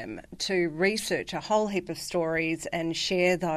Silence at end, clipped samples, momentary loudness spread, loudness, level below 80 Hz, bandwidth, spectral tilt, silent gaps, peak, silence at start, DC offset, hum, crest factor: 0 s; under 0.1%; 7 LU; -28 LUFS; -58 dBFS; 13.5 kHz; -4 dB/octave; none; -10 dBFS; 0 s; under 0.1%; none; 18 dB